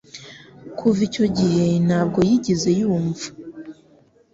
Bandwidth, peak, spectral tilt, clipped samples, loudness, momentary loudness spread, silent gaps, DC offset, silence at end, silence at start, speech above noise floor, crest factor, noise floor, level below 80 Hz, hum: 7.8 kHz; -6 dBFS; -6.5 dB/octave; under 0.1%; -20 LUFS; 21 LU; none; under 0.1%; 0.6 s; 0.15 s; 36 dB; 14 dB; -54 dBFS; -52 dBFS; none